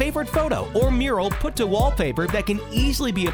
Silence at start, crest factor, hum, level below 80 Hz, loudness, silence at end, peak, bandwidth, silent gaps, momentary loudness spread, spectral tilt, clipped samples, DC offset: 0 s; 16 dB; none; -28 dBFS; -22 LUFS; 0 s; -6 dBFS; over 20 kHz; none; 4 LU; -5.5 dB/octave; under 0.1%; under 0.1%